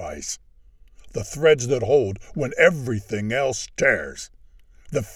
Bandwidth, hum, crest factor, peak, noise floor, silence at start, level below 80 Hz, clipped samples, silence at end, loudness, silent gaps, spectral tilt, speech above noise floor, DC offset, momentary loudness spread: 14 kHz; none; 22 dB; 0 dBFS; -50 dBFS; 0 s; -48 dBFS; under 0.1%; 0 s; -22 LUFS; none; -4.5 dB/octave; 29 dB; under 0.1%; 16 LU